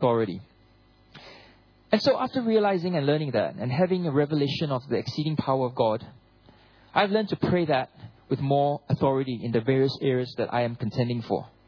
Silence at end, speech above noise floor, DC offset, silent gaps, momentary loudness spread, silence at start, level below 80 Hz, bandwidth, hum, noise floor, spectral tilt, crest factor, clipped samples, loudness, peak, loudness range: 0.2 s; 33 dB; under 0.1%; none; 6 LU; 0 s; -62 dBFS; 5.4 kHz; none; -58 dBFS; -8 dB/octave; 20 dB; under 0.1%; -26 LUFS; -6 dBFS; 2 LU